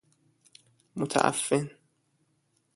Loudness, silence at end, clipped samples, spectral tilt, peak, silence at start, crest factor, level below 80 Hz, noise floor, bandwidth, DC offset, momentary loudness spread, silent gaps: -28 LUFS; 1.05 s; under 0.1%; -4 dB/octave; -6 dBFS; 0.95 s; 28 dB; -72 dBFS; -73 dBFS; 12 kHz; under 0.1%; 16 LU; none